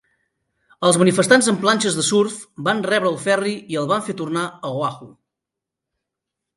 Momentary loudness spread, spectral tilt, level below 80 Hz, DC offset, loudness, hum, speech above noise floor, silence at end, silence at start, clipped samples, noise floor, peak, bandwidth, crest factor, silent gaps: 11 LU; -4 dB/octave; -66 dBFS; under 0.1%; -19 LUFS; none; 66 dB; 1.45 s; 0.8 s; under 0.1%; -84 dBFS; 0 dBFS; 11.5 kHz; 20 dB; none